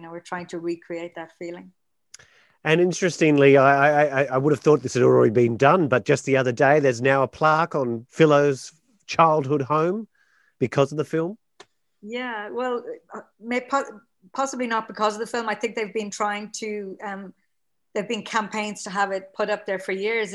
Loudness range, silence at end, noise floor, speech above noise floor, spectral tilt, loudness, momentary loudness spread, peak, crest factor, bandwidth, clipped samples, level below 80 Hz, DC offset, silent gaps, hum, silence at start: 11 LU; 0 s; -80 dBFS; 58 dB; -5.5 dB/octave; -22 LUFS; 16 LU; 0 dBFS; 22 dB; 12 kHz; under 0.1%; -68 dBFS; under 0.1%; none; none; 0 s